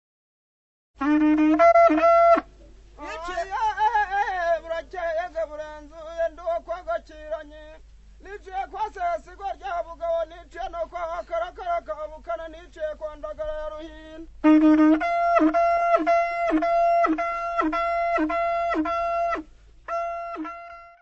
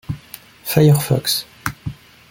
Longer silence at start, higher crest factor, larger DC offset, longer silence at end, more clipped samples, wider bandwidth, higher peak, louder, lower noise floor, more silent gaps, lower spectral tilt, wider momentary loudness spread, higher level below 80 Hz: first, 1 s vs 0.1 s; about the same, 18 dB vs 20 dB; neither; second, 0.15 s vs 0.35 s; neither; second, 7.8 kHz vs 17 kHz; second, -6 dBFS vs 0 dBFS; second, -23 LUFS vs -17 LUFS; first, -48 dBFS vs -41 dBFS; neither; about the same, -5.5 dB/octave vs -5.5 dB/octave; about the same, 18 LU vs 19 LU; about the same, -48 dBFS vs -46 dBFS